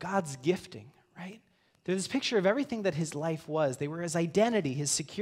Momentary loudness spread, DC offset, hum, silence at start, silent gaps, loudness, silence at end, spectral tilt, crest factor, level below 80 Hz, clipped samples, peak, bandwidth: 19 LU; under 0.1%; none; 0 s; none; -31 LUFS; 0 s; -4.5 dB/octave; 18 dB; -70 dBFS; under 0.1%; -14 dBFS; 16 kHz